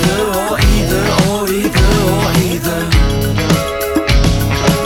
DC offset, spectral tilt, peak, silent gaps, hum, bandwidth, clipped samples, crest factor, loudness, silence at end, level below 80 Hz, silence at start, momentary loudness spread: under 0.1%; -5 dB/octave; 0 dBFS; none; none; 19 kHz; under 0.1%; 12 dB; -13 LUFS; 0 s; -18 dBFS; 0 s; 3 LU